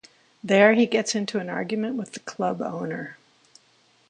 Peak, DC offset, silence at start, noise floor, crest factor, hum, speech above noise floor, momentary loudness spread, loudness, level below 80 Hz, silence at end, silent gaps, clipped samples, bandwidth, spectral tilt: -4 dBFS; under 0.1%; 0.45 s; -61 dBFS; 22 dB; none; 38 dB; 18 LU; -23 LUFS; -74 dBFS; 0.95 s; none; under 0.1%; 10 kHz; -4.5 dB/octave